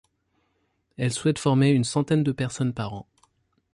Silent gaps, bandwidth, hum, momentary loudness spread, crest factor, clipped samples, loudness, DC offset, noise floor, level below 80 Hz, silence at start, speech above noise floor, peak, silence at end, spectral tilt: none; 11.5 kHz; none; 12 LU; 16 dB; under 0.1%; -24 LUFS; under 0.1%; -72 dBFS; -58 dBFS; 1 s; 48 dB; -10 dBFS; 0.7 s; -6 dB/octave